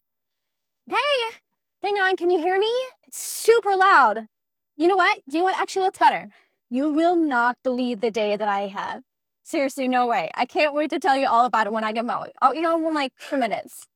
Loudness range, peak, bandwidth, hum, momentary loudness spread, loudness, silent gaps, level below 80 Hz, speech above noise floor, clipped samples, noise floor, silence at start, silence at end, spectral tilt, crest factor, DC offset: 4 LU; -4 dBFS; over 20 kHz; none; 11 LU; -22 LUFS; none; -78 dBFS; 62 dB; under 0.1%; -83 dBFS; 0.9 s; 0.1 s; -3 dB/octave; 18 dB; under 0.1%